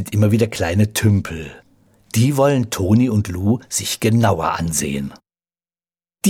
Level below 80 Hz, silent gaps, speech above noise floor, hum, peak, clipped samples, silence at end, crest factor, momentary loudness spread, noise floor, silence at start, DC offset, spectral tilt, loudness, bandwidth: -44 dBFS; none; over 73 dB; none; -2 dBFS; under 0.1%; 0 s; 16 dB; 9 LU; under -90 dBFS; 0 s; under 0.1%; -5.5 dB/octave; -18 LUFS; 17 kHz